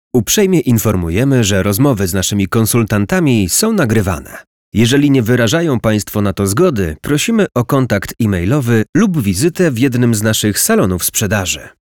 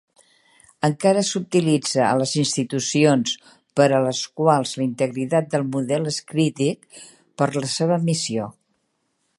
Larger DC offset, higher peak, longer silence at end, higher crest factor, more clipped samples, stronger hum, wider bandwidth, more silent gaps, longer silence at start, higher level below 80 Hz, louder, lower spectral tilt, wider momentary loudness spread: first, 0.3% vs under 0.1%; about the same, -2 dBFS vs -2 dBFS; second, 0.2 s vs 0.9 s; second, 10 dB vs 20 dB; neither; neither; first, 19.5 kHz vs 11.5 kHz; first, 4.47-4.72 s, 8.89-8.93 s vs none; second, 0.15 s vs 0.85 s; first, -38 dBFS vs -68 dBFS; first, -13 LUFS vs -21 LUFS; about the same, -5 dB/octave vs -5 dB/octave; second, 4 LU vs 7 LU